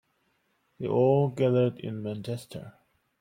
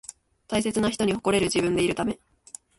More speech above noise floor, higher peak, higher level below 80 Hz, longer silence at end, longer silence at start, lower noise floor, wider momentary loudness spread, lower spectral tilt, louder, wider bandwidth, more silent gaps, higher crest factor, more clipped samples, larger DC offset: first, 46 dB vs 24 dB; about the same, -10 dBFS vs -10 dBFS; second, -68 dBFS vs -52 dBFS; second, 0.5 s vs 0.65 s; first, 0.8 s vs 0.1 s; first, -72 dBFS vs -48 dBFS; second, 14 LU vs 20 LU; first, -8.5 dB/octave vs -4.5 dB/octave; about the same, -27 LUFS vs -25 LUFS; first, 16 kHz vs 12 kHz; neither; about the same, 18 dB vs 16 dB; neither; neither